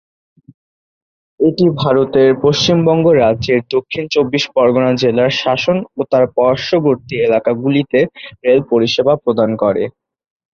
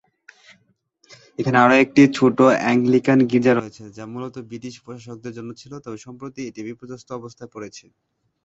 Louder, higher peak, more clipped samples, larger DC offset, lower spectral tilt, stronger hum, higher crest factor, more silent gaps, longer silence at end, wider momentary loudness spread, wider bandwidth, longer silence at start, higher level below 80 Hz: about the same, -14 LUFS vs -16 LUFS; about the same, -2 dBFS vs -2 dBFS; neither; neither; about the same, -6 dB/octave vs -6.5 dB/octave; neither; second, 12 dB vs 20 dB; neither; about the same, 0.65 s vs 0.65 s; second, 5 LU vs 23 LU; second, 7.2 kHz vs 8 kHz; about the same, 1.4 s vs 1.4 s; first, -48 dBFS vs -60 dBFS